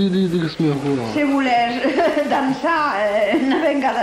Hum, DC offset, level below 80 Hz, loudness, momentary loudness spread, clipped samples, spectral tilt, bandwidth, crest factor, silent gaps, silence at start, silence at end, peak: none; under 0.1%; -52 dBFS; -18 LUFS; 3 LU; under 0.1%; -6.5 dB/octave; 13 kHz; 12 dB; none; 0 s; 0 s; -6 dBFS